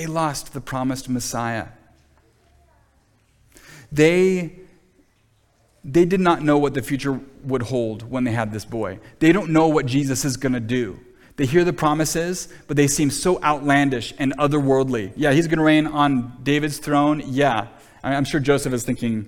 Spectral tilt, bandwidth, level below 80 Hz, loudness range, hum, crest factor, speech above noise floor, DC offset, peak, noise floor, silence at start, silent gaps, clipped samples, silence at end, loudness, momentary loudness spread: -5.5 dB/octave; 18 kHz; -46 dBFS; 5 LU; none; 18 dB; 41 dB; under 0.1%; -2 dBFS; -61 dBFS; 0 s; none; under 0.1%; 0 s; -20 LUFS; 11 LU